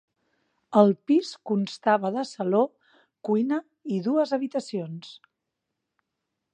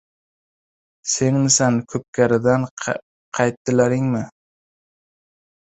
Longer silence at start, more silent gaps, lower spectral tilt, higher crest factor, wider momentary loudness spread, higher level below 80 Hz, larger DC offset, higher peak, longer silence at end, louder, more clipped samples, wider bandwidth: second, 0.7 s vs 1.05 s; second, none vs 2.08-2.13 s, 2.71-2.77 s, 3.02-3.32 s, 3.57-3.65 s; first, -7 dB/octave vs -4.5 dB/octave; about the same, 22 dB vs 20 dB; about the same, 13 LU vs 13 LU; second, -80 dBFS vs -56 dBFS; neither; about the same, -4 dBFS vs -2 dBFS; about the same, 1.4 s vs 1.5 s; second, -25 LUFS vs -19 LUFS; neither; first, 9.4 kHz vs 8.2 kHz